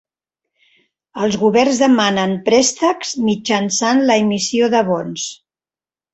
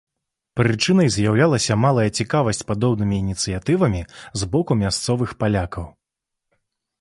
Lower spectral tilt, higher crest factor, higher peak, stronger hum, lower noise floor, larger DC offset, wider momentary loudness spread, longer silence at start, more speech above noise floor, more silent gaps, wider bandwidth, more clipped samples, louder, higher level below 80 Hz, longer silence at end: second, -3.5 dB/octave vs -5.5 dB/octave; about the same, 16 dB vs 18 dB; about the same, 0 dBFS vs -2 dBFS; neither; first, under -90 dBFS vs -82 dBFS; neither; second, 8 LU vs 11 LU; first, 1.15 s vs 0.55 s; first, over 75 dB vs 63 dB; neither; second, 8.2 kHz vs 11.5 kHz; neither; first, -15 LUFS vs -20 LUFS; second, -58 dBFS vs -40 dBFS; second, 0.8 s vs 1.1 s